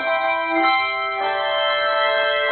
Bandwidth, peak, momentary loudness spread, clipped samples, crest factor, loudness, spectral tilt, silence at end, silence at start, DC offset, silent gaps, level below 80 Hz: 4.6 kHz; -6 dBFS; 4 LU; under 0.1%; 14 dB; -19 LUFS; -6 dB/octave; 0 s; 0 s; under 0.1%; none; -62 dBFS